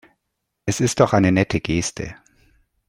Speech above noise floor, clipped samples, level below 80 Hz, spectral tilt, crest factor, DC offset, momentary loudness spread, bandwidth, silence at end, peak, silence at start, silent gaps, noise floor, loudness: 58 dB; under 0.1%; -46 dBFS; -5.5 dB/octave; 20 dB; under 0.1%; 15 LU; 16 kHz; 0.75 s; -2 dBFS; 0.65 s; none; -77 dBFS; -20 LUFS